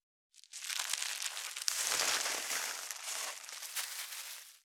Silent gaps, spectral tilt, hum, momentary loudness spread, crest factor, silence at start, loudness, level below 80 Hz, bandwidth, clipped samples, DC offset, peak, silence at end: none; 3 dB/octave; none; 12 LU; 34 dB; 0.35 s; -36 LUFS; under -90 dBFS; over 20 kHz; under 0.1%; under 0.1%; -4 dBFS; 0.05 s